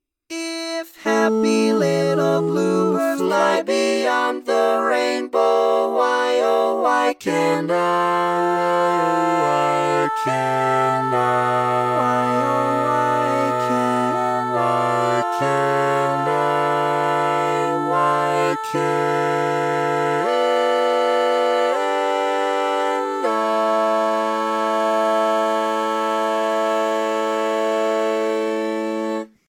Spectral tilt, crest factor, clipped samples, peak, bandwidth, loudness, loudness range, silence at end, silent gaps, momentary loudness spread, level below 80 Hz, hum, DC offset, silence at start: -5 dB/octave; 16 dB; under 0.1%; -4 dBFS; 17 kHz; -19 LUFS; 1 LU; 0.25 s; none; 3 LU; -74 dBFS; none; under 0.1%; 0.3 s